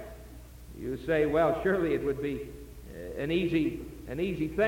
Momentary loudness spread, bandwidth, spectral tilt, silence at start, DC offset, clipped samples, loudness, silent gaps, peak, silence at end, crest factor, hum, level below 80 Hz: 21 LU; 17 kHz; -7 dB/octave; 0 s; under 0.1%; under 0.1%; -30 LUFS; none; -14 dBFS; 0 s; 16 dB; none; -48 dBFS